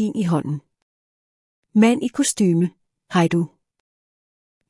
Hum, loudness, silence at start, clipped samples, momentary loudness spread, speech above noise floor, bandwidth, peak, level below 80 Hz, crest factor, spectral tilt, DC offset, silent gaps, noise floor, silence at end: none; -20 LUFS; 0 s; under 0.1%; 11 LU; over 71 dB; 12 kHz; -4 dBFS; -66 dBFS; 18 dB; -5.5 dB/octave; under 0.1%; 0.82-1.63 s; under -90 dBFS; 1.25 s